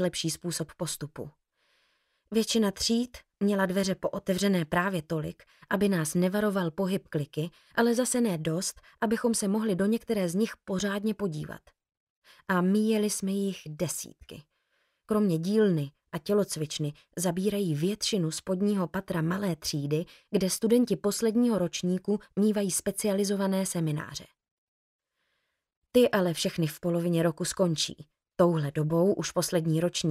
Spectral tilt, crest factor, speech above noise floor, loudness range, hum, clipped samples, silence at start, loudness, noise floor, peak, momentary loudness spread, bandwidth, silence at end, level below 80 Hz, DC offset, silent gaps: -5 dB/octave; 18 dB; 51 dB; 3 LU; none; under 0.1%; 0 s; -28 LUFS; -79 dBFS; -10 dBFS; 9 LU; 15.5 kHz; 0 s; -62 dBFS; under 0.1%; 11.97-12.22 s, 24.51-24.99 s, 25.77-25.82 s